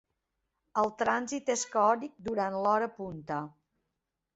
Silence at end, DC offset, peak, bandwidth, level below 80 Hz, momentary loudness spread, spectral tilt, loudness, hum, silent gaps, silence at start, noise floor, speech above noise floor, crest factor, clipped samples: 0.85 s; under 0.1%; -14 dBFS; 8 kHz; -70 dBFS; 10 LU; -4 dB/octave; -31 LUFS; none; none; 0.75 s; -85 dBFS; 55 dB; 20 dB; under 0.1%